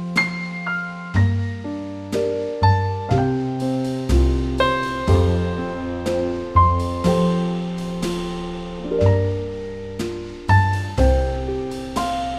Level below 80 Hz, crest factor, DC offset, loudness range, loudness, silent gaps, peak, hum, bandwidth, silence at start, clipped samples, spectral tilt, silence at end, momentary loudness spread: -28 dBFS; 16 dB; under 0.1%; 2 LU; -21 LUFS; none; -4 dBFS; none; 12.5 kHz; 0 s; under 0.1%; -7 dB/octave; 0 s; 10 LU